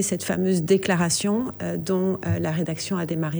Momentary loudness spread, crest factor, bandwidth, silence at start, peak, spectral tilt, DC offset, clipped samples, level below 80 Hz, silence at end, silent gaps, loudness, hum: 6 LU; 16 dB; over 20 kHz; 0 s; -8 dBFS; -5 dB/octave; under 0.1%; under 0.1%; -56 dBFS; 0 s; none; -24 LUFS; none